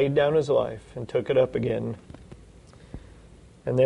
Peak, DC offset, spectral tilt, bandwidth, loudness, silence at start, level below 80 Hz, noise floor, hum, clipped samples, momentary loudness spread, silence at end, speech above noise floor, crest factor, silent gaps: -10 dBFS; under 0.1%; -7.5 dB/octave; 10.5 kHz; -26 LUFS; 0 s; -52 dBFS; -50 dBFS; none; under 0.1%; 23 LU; 0 s; 26 dB; 16 dB; none